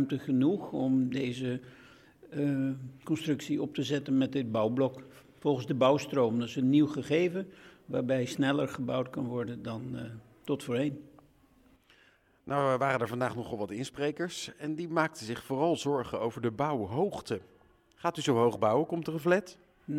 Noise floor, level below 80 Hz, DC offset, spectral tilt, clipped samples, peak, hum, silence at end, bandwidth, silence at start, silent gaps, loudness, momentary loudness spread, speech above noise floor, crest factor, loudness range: -65 dBFS; -68 dBFS; under 0.1%; -6.5 dB/octave; under 0.1%; -12 dBFS; none; 0 s; 15 kHz; 0 s; none; -31 LUFS; 12 LU; 34 dB; 18 dB; 5 LU